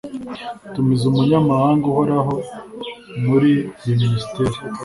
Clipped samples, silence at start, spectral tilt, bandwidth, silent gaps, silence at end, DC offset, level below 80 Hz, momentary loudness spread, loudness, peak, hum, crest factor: under 0.1%; 0.05 s; -8 dB/octave; 11.5 kHz; none; 0 s; under 0.1%; -48 dBFS; 16 LU; -18 LUFS; -4 dBFS; none; 14 dB